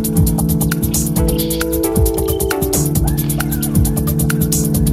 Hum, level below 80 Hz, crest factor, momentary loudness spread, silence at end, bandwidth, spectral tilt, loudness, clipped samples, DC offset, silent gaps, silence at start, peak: none; -24 dBFS; 14 dB; 2 LU; 0 s; 16 kHz; -5.5 dB/octave; -16 LUFS; under 0.1%; under 0.1%; none; 0 s; -2 dBFS